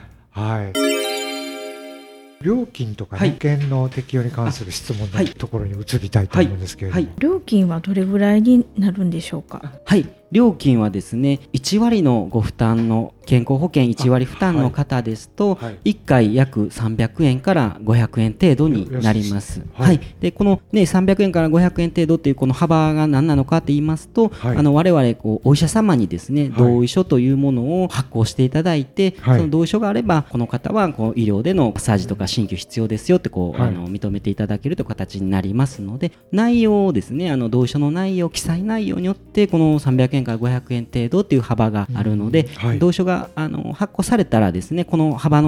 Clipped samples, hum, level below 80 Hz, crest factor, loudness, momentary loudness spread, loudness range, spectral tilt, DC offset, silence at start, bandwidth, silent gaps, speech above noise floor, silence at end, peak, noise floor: under 0.1%; none; -42 dBFS; 16 dB; -18 LUFS; 9 LU; 5 LU; -7 dB/octave; under 0.1%; 0.35 s; 15.5 kHz; none; 23 dB; 0 s; -2 dBFS; -40 dBFS